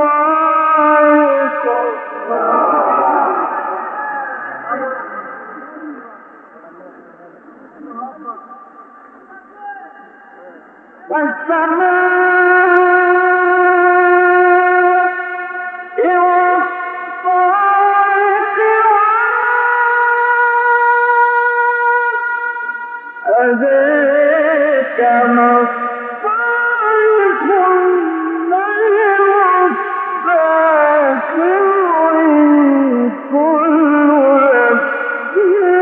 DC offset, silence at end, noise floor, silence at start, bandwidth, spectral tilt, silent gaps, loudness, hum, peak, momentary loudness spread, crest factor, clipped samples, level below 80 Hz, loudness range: under 0.1%; 0 s; -40 dBFS; 0 s; 4.1 kHz; -8 dB/octave; none; -12 LUFS; none; 0 dBFS; 13 LU; 12 dB; under 0.1%; -76 dBFS; 15 LU